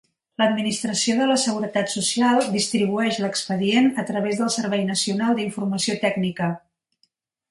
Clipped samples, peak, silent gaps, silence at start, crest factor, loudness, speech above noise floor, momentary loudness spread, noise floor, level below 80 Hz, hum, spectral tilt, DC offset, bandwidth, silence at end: under 0.1%; -6 dBFS; none; 0.4 s; 16 dB; -22 LUFS; 47 dB; 6 LU; -68 dBFS; -66 dBFS; none; -4 dB/octave; under 0.1%; 11.5 kHz; 0.9 s